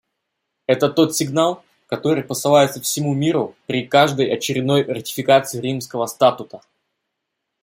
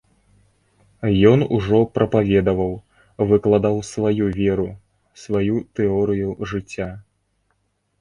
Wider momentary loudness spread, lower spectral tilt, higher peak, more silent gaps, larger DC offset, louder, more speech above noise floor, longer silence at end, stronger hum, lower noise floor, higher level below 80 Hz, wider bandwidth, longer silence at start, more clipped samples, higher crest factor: about the same, 10 LU vs 12 LU; second, -4.5 dB/octave vs -7.5 dB/octave; about the same, -2 dBFS vs 0 dBFS; neither; neither; about the same, -18 LUFS vs -20 LUFS; first, 60 dB vs 50 dB; about the same, 1.05 s vs 1 s; neither; first, -78 dBFS vs -68 dBFS; second, -64 dBFS vs -44 dBFS; first, 16.5 kHz vs 10.5 kHz; second, 0.7 s vs 1 s; neither; about the same, 18 dB vs 20 dB